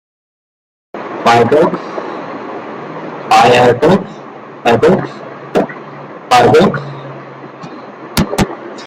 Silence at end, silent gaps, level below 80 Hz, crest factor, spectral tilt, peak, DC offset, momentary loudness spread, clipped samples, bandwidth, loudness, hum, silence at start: 0 s; none; -40 dBFS; 14 dB; -5.5 dB/octave; 0 dBFS; under 0.1%; 22 LU; under 0.1%; 16 kHz; -11 LUFS; none; 0.95 s